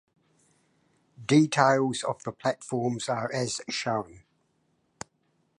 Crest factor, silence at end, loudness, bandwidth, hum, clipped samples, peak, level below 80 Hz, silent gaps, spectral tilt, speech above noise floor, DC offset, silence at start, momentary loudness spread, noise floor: 24 dB; 1.4 s; -27 LUFS; 11 kHz; none; under 0.1%; -6 dBFS; -68 dBFS; none; -5 dB/octave; 45 dB; under 0.1%; 1.2 s; 23 LU; -72 dBFS